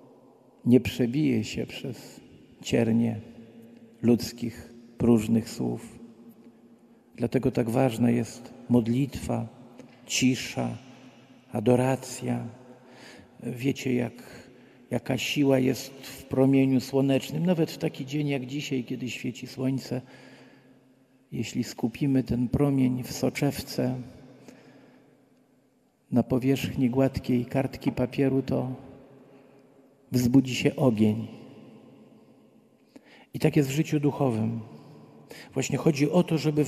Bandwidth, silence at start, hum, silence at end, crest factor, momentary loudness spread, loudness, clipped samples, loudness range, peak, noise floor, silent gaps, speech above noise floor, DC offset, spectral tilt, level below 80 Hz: 14.5 kHz; 0.65 s; none; 0 s; 22 dB; 16 LU; -27 LUFS; under 0.1%; 5 LU; -6 dBFS; -66 dBFS; none; 40 dB; under 0.1%; -6.5 dB/octave; -56 dBFS